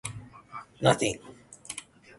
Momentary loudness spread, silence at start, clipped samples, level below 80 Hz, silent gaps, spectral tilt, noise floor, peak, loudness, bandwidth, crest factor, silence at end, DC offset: 22 LU; 0.05 s; under 0.1%; -60 dBFS; none; -4 dB/octave; -46 dBFS; -6 dBFS; -29 LUFS; 12 kHz; 26 dB; 0.4 s; under 0.1%